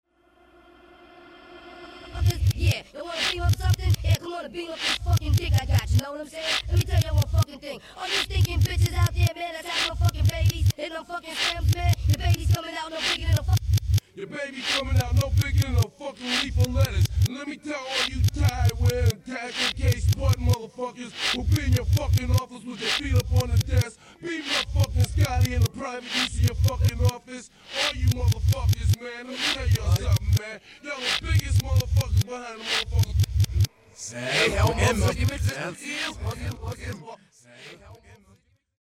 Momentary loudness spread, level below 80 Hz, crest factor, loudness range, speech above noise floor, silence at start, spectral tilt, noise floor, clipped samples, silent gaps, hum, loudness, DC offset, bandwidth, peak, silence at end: 11 LU; -32 dBFS; 16 dB; 1 LU; 36 dB; 1.35 s; -4.5 dB/octave; -60 dBFS; under 0.1%; none; none; -25 LUFS; under 0.1%; 15.5 kHz; -8 dBFS; 0.65 s